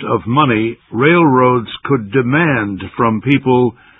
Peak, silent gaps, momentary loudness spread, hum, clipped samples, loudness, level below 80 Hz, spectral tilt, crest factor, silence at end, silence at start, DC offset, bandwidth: 0 dBFS; none; 8 LU; none; under 0.1%; -14 LUFS; -46 dBFS; -10 dB/octave; 14 dB; 0.25 s; 0 s; under 0.1%; 4 kHz